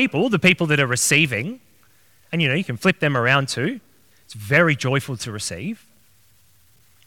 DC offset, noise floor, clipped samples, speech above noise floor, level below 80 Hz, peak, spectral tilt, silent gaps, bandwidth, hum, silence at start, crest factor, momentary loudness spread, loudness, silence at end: 0.2%; -58 dBFS; under 0.1%; 38 dB; -62 dBFS; 0 dBFS; -4 dB/octave; none; 18 kHz; none; 0 s; 22 dB; 16 LU; -19 LUFS; 1.3 s